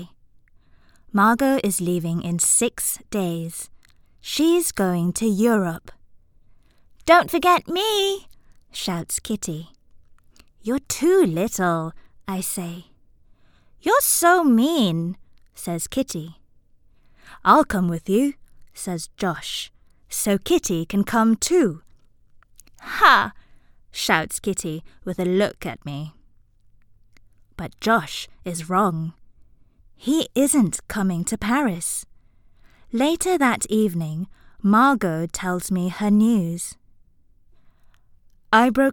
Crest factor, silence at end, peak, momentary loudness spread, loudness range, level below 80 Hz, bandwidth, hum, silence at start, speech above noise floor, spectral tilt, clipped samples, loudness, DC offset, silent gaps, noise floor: 22 dB; 0 s; 0 dBFS; 16 LU; 5 LU; -50 dBFS; 19 kHz; none; 0 s; 34 dB; -4 dB/octave; under 0.1%; -21 LUFS; under 0.1%; none; -54 dBFS